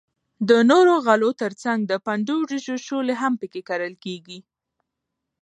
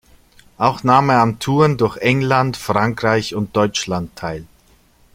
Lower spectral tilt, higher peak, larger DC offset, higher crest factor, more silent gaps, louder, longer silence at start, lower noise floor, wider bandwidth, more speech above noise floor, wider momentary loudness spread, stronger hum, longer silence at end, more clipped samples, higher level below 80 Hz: about the same, -5 dB/octave vs -5.5 dB/octave; about the same, -2 dBFS vs 0 dBFS; neither; about the same, 20 dB vs 16 dB; neither; second, -21 LUFS vs -17 LUFS; second, 0.4 s vs 0.6 s; first, -81 dBFS vs -53 dBFS; second, 10 kHz vs 16.5 kHz; first, 61 dB vs 36 dB; first, 15 LU vs 10 LU; neither; first, 1 s vs 0.7 s; neither; second, -76 dBFS vs -48 dBFS